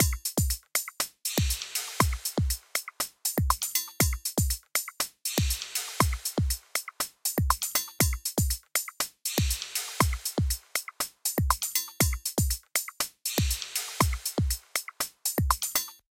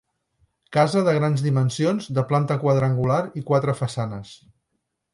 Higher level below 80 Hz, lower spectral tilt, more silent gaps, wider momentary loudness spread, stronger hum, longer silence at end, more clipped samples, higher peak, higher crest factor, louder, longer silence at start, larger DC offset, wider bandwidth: first, -36 dBFS vs -56 dBFS; second, -3 dB/octave vs -7 dB/octave; neither; about the same, 5 LU vs 7 LU; neither; second, 0.2 s vs 0.8 s; neither; about the same, -6 dBFS vs -6 dBFS; first, 24 dB vs 16 dB; second, -29 LUFS vs -22 LUFS; second, 0 s vs 0.7 s; neither; first, 17 kHz vs 11.5 kHz